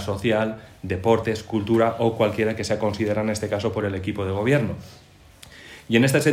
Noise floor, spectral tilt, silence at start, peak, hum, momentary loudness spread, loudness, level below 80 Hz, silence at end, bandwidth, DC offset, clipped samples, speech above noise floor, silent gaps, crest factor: -48 dBFS; -6 dB/octave; 0 s; -6 dBFS; none; 10 LU; -23 LUFS; -54 dBFS; 0 s; 16 kHz; under 0.1%; under 0.1%; 26 dB; none; 18 dB